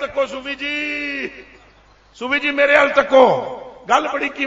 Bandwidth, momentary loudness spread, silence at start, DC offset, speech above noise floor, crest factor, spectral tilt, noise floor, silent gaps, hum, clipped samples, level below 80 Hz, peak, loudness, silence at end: 7.8 kHz; 16 LU; 0 s; under 0.1%; 33 dB; 18 dB; -3.5 dB/octave; -50 dBFS; none; none; under 0.1%; -54 dBFS; 0 dBFS; -17 LUFS; 0 s